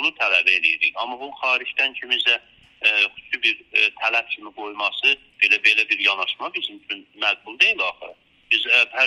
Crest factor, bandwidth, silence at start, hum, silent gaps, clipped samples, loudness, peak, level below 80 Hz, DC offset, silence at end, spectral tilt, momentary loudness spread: 20 dB; 12 kHz; 0 s; none; none; under 0.1%; -19 LUFS; -2 dBFS; -70 dBFS; under 0.1%; 0 s; 0 dB/octave; 12 LU